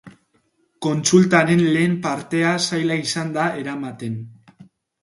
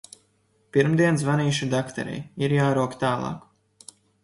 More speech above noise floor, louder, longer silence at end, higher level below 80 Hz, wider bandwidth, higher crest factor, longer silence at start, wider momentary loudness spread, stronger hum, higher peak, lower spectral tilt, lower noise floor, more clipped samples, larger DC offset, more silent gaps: about the same, 46 dB vs 43 dB; first, -19 LUFS vs -24 LUFS; second, 0.4 s vs 0.85 s; about the same, -62 dBFS vs -60 dBFS; about the same, 11.5 kHz vs 11.5 kHz; about the same, 20 dB vs 18 dB; second, 0.05 s vs 0.75 s; about the same, 14 LU vs 12 LU; neither; first, 0 dBFS vs -6 dBFS; about the same, -5 dB/octave vs -6 dB/octave; about the same, -64 dBFS vs -66 dBFS; neither; neither; neither